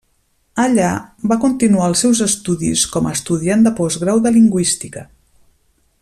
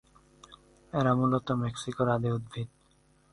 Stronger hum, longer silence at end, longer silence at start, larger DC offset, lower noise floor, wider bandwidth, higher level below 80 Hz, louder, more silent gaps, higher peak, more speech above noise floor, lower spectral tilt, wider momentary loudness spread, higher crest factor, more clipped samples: neither; first, 0.95 s vs 0.65 s; about the same, 0.55 s vs 0.5 s; neither; second, -61 dBFS vs -65 dBFS; first, 14 kHz vs 11.5 kHz; first, -48 dBFS vs -60 dBFS; first, -15 LUFS vs -30 LUFS; neither; first, -2 dBFS vs -14 dBFS; first, 46 dB vs 36 dB; second, -4.5 dB/octave vs -7 dB/octave; second, 8 LU vs 14 LU; about the same, 14 dB vs 18 dB; neither